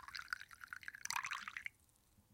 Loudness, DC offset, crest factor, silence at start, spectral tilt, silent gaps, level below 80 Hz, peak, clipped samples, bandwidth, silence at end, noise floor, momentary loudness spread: -46 LUFS; under 0.1%; 26 dB; 0 s; 1.5 dB/octave; none; -78 dBFS; -22 dBFS; under 0.1%; 16.5 kHz; 0 s; -72 dBFS; 10 LU